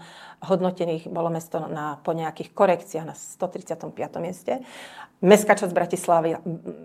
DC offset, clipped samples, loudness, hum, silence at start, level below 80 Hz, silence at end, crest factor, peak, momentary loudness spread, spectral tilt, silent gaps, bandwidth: under 0.1%; under 0.1%; -24 LUFS; none; 0 s; -70 dBFS; 0 s; 24 dB; 0 dBFS; 16 LU; -5.5 dB/octave; none; 16 kHz